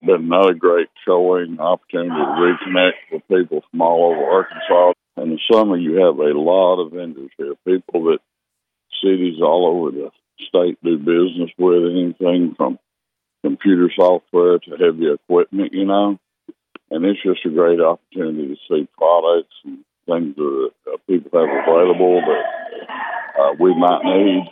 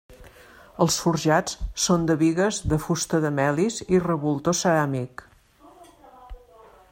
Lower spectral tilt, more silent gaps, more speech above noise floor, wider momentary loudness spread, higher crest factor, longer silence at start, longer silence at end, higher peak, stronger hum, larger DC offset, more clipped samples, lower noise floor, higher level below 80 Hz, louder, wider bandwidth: first, -8.5 dB/octave vs -5 dB/octave; neither; first, 64 dB vs 30 dB; first, 12 LU vs 8 LU; about the same, 16 dB vs 18 dB; about the same, 0.05 s vs 0.1 s; second, 0 s vs 0.55 s; first, 0 dBFS vs -6 dBFS; neither; neither; neither; first, -79 dBFS vs -53 dBFS; second, -74 dBFS vs -44 dBFS; first, -17 LUFS vs -23 LUFS; second, 4.5 kHz vs 16 kHz